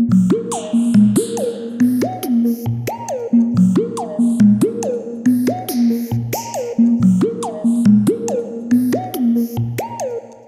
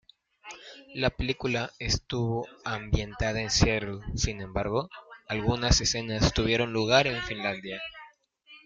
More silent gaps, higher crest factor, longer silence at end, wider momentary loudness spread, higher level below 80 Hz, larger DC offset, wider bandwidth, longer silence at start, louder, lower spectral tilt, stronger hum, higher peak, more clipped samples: neither; second, 14 dB vs 22 dB; about the same, 0.1 s vs 0.1 s; second, 10 LU vs 15 LU; second, -54 dBFS vs -40 dBFS; neither; first, 15.5 kHz vs 9.4 kHz; second, 0 s vs 0.45 s; first, -17 LUFS vs -28 LUFS; first, -7 dB/octave vs -4 dB/octave; neither; first, -2 dBFS vs -6 dBFS; neither